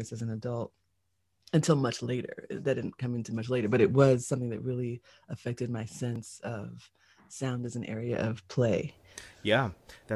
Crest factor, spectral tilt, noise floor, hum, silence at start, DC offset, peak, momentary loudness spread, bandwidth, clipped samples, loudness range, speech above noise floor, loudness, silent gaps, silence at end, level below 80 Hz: 22 dB; -6 dB/octave; -78 dBFS; none; 0 s; under 0.1%; -8 dBFS; 16 LU; 12.5 kHz; under 0.1%; 9 LU; 48 dB; -31 LUFS; none; 0 s; -60 dBFS